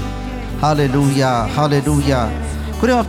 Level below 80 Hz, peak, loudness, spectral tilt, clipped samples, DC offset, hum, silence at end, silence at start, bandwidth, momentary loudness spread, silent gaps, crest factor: -28 dBFS; -2 dBFS; -17 LUFS; -6 dB/octave; under 0.1%; under 0.1%; none; 0 s; 0 s; 16 kHz; 10 LU; none; 14 dB